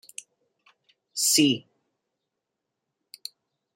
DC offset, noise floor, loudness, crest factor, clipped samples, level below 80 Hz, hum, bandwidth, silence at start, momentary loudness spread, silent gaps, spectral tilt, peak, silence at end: under 0.1%; -84 dBFS; -22 LUFS; 22 dB; under 0.1%; -74 dBFS; none; 16 kHz; 1.15 s; 23 LU; none; -2 dB/octave; -8 dBFS; 2.15 s